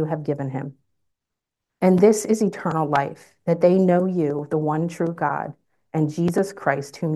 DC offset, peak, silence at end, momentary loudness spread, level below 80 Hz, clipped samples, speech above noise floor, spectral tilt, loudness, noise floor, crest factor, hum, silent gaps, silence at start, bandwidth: under 0.1%; -4 dBFS; 0 s; 13 LU; -66 dBFS; under 0.1%; 64 dB; -7 dB/octave; -22 LUFS; -85 dBFS; 18 dB; none; none; 0 s; 12.5 kHz